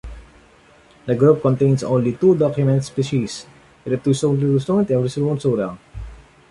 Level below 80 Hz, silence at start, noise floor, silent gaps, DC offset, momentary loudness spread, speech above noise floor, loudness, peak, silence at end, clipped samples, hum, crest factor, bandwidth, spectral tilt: -44 dBFS; 0.05 s; -50 dBFS; none; under 0.1%; 19 LU; 33 dB; -19 LUFS; -2 dBFS; 0.35 s; under 0.1%; none; 16 dB; 11.5 kHz; -7.5 dB/octave